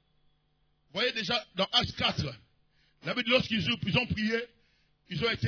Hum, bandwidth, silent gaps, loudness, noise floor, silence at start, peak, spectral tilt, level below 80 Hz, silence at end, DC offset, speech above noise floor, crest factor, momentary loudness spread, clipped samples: none; 5.4 kHz; none; -29 LUFS; -71 dBFS; 0.95 s; -10 dBFS; -5 dB/octave; -56 dBFS; 0 s; under 0.1%; 42 dB; 22 dB; 13 LU; under 0.1%